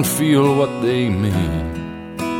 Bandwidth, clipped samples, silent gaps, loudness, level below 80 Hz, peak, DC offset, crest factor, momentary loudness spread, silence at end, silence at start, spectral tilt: 17.5 kHz; under 0.1%; none; -18 LUFS; -36 dBFS; -4 dBFS; under 0.1%; 14 dB; 13 LU; 0 s; 0 s; -5.5 dB/octave